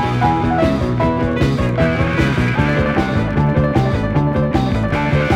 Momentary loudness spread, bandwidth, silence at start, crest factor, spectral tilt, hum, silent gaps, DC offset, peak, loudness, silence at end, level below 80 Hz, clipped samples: 2 LU; 11 kHz; 0 s; 14 dB; -7.5 dB/octave; none; none; under 0.1%; -2 dBFS; -16 LUFS; 0 s; -28 dBFS; under 0.1%